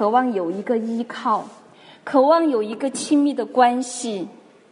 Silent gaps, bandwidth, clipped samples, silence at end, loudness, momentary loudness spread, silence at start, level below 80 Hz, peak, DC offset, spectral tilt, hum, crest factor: none; 11 kHz; under 0.1%; 0.4 s; -21 LUFS; 12 LU; 0 s; -76 dBFS; -2 dBFS; under 0.1%; -4 dB/octave; none; 18 dB